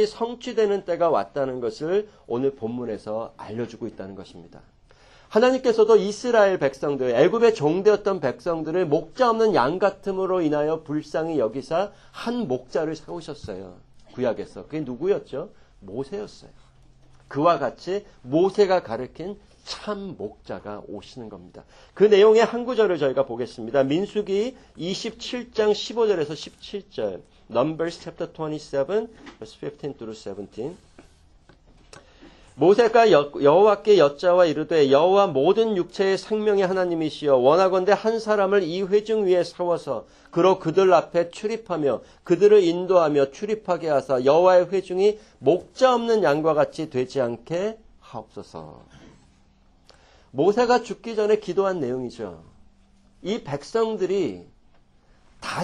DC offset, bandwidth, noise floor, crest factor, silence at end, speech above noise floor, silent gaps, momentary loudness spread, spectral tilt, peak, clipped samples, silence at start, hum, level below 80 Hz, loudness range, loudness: under 0.1%; 10 kHz; -57 dBFS; 18 dB; 0 s; 35 dB; none; 18 LU; -6 dB/octave; -4 dBFS; under 0.1%; 0 s; none; -56 dBFS; 11 LU; -22 LUFS